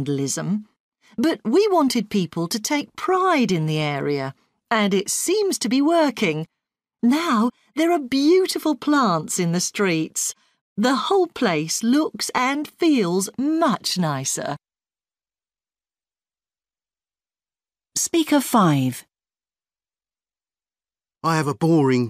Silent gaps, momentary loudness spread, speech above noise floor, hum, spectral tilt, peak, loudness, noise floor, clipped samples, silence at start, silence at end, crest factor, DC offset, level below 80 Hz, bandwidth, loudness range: 0.80-0.92 s, 10.61-10.76 s; 8 LU; over 70 dB; none; -4.5 dB/octave; -6 dBFS; -21 LUFS; under -90 dBFS; under 0.1%; 0 s; 0 s; 16 dB; under 0.1%; -66 dBFS; 15.5 kHz; 6 LU